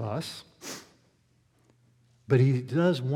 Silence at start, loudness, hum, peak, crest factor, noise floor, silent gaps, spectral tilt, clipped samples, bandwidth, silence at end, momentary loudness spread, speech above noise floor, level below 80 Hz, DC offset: 0 s; -26 LUFS; none; -10 dBFS; 18 dB; -67 dBFS; none; -7 dB/octave; under 0.1%; 14 kHz; 0 s; 18 LU; 42 dB; -74 dBFS; under 0.1%